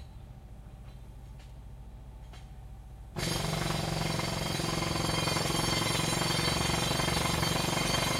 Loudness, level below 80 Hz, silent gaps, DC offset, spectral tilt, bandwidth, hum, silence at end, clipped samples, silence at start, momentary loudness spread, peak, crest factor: -30 LUFS; -46 dBFS; none; under 0.1%; -3.5 dB/octave; 16.5 kHz; none; 0 s; under 0.1%; 0 s; 21 LU; -16 dBFS; 18 dB